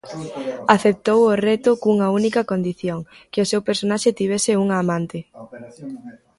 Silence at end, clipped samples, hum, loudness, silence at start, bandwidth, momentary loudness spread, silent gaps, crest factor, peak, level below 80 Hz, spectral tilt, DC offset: 0.3 s; under 0.1%; none; -19 LUFS; 0.05 s; 11.5 kHz; 19 LU; none; 20 dB; 0 dBFS; -60 dBFS; -5 dB/octave; under 0.1%